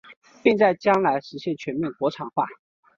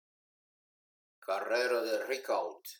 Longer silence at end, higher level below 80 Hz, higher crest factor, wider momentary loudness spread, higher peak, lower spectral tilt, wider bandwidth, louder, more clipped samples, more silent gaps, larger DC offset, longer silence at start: first, 0.45 s vs 0.05 s; first, -66 dBFS vs under -90 dBFS; about the same, 20 dB vs 16 dB; first, 11 LU vs 7 LU; first, -4 dBFS vs -20 dBFS; first, -6.5 dB/octave vs -1 dB/octave; second, 7.4 kHz vs 19 kHz; first, -23 LUFS vs -33 LUFS; neither; first, 0.17-0.22 s vs none; neither; second, 0.1 s vs 1.2 s